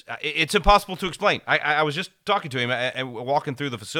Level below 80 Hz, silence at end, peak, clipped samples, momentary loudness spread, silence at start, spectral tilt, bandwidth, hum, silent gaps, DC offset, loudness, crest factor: -38 dBFS; 0 s; -2 dBFS; under 0.1%; 11 LU; 0.1 s; -4 dB/octave; 17 kHz; none; none; under 0.1%; -23 LUFS; 22 dB